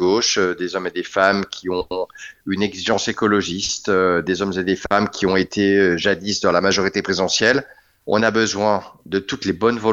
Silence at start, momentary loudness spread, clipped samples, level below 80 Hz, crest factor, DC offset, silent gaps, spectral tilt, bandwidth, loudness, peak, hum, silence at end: 0 s; 8 LU; under 0.1%; -50 dBFS; 18 dB; under 0.1%; none; -3.5 dB/octave; 8 kHz; -19 LUFS; 0 dBFS; none; 0 s